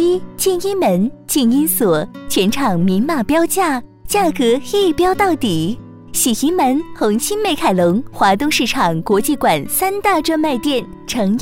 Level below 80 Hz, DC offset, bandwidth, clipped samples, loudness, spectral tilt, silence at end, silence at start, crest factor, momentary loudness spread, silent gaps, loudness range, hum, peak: -42 dBFS; under 0.1%; 16 kHz; under 0.1%; -16 LUFS; -4 dB/octave; 0 s; 0 s; 14 dB; 5 LU; none; 1 LU; none; -2 dBFS